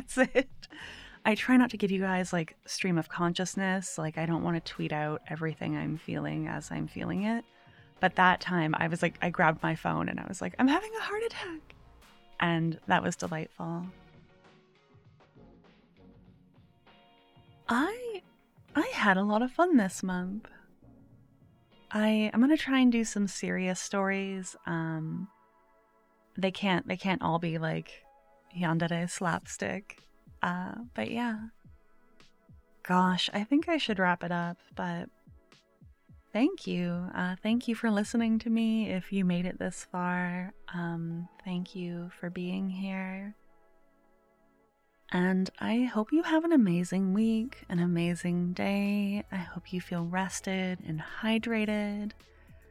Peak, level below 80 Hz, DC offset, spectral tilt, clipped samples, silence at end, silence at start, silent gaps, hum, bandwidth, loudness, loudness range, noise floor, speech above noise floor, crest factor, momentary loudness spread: -10 dBFS; -62 dBFS; under 0.1%; -5.5 dB/octave; under 0.1%; 0.1 s; 0 s; none; none; 14 kHz; -31 LUFS; 8 LU; -69 dBFS; 39 dB; 22 dB; 13 LU